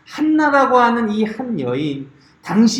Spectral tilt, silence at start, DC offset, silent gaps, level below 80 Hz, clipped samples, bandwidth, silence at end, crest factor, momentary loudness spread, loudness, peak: -5.5 dB/octave; 0.1 s; under 0.1%; none; -58 dBFS; under 0.1%; 10.5 kHz; 0 s; 16 dB; 12 LU; -17 LUFS; 0 dBFS